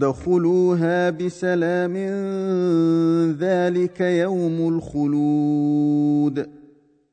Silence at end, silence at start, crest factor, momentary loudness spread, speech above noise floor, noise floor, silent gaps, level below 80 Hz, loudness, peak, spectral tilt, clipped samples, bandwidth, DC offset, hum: 0.55 s; 0 s; 12 dB; 6 LU; 33 dB; -53 dBFS; none; -56 dBFS; -20 LUFS; -8 dBFS; -8 dB/octave; under 0.1%; 9.2 kHz; under 0.1%; none